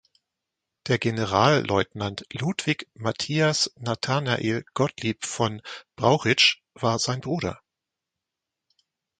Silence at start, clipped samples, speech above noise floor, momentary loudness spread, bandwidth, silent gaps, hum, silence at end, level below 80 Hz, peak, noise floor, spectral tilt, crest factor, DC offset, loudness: 0.85 s; under 0.1%; 62 dB; 10 LU; 9.4 kHz; none; none; 1.65 s; -56 dBFS; -4 dBFS; -86 dBFS; -4 dB/octave; 22 dB; under 0.1%; -24 LUFS